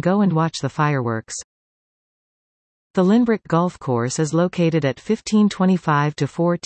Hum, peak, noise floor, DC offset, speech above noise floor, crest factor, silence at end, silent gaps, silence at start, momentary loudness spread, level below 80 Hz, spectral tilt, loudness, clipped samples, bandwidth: none; -4 dBFS; under -90 dBFS; under 0.1%; over 71 dB; 16 dB; 0.1 s; 1.44-2.94 s; 0.05 s; 7 LU; -58 dBFS; -6.5 dB/octave; -20 LUFS; under 0.1%; 8.8 kHz